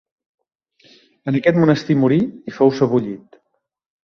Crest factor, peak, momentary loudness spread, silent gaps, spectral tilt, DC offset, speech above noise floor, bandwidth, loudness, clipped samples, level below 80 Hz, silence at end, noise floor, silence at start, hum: 18 dB; -2 dBFS; 14 LU; none; -8 dB/octave; under 0.1%; 56 dB; 6.6 kHz; -17 LUFS; under 0.1%; -58 dBFS; 0.85 s; -73 dBFS; 1.25 s; none